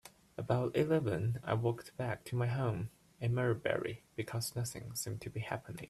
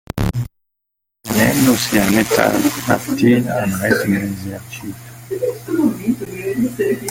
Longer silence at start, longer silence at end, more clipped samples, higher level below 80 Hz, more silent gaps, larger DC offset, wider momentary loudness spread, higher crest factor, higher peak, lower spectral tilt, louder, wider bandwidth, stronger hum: about the same, 0.05 s vs 0.15 s; about the same, 0 s vs 0 s; neither; second, -64 dBFS vs -40 dBFS; neither; neither; second, 10 LU vs 15 LU; about the same, 20 dB vs 18 dB; second, -16 dBFS vs 0 dBFS; about the same, -6 dB/octave vs -5 dB/octave; second, -37 LUFS vs -17 LUFS; second, 13.5 kHz vs 17 kHz; neither